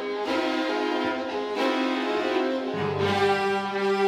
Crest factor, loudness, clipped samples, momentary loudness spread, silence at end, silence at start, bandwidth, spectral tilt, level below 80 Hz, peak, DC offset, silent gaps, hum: 14 dB; -26 LUFS; under 0.1%; 5 LU; 0 s; 0 s; 13.5 kHz; -5 dB/octave; -68 dBFS; -10 dBFS; under 0.1%; none; none